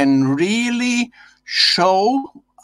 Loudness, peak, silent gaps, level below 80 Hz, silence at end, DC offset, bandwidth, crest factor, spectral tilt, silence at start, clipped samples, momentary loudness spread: -16 LUFS; -2 dBFS; none; -62 dBFS; 0.25 s; under 0.1%; 12 kHz; 16 dB; -4 dB/octave; 0 s; under 0.1%; 10 LU